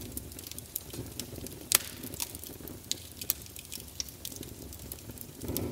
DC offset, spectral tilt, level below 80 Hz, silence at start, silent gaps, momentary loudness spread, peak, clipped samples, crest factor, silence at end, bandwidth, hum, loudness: under 0.1%; -2 dB/octave; -54 dBFS; 0 s; none; 16 LU; 0 dBFS; under 0.1%; 38 dB; 0 s; 16.5 kHz; none; -36 LUFS